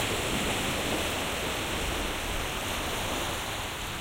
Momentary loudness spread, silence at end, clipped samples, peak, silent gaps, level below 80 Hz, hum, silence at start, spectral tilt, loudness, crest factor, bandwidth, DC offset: 3 LU; 0 s; under 0.1%; -18 dBFS; none; -40 dBFS; none; 0 s; -3 dB/octave; -30 LUFS; 14 dB; 16 kHz; under 0.1%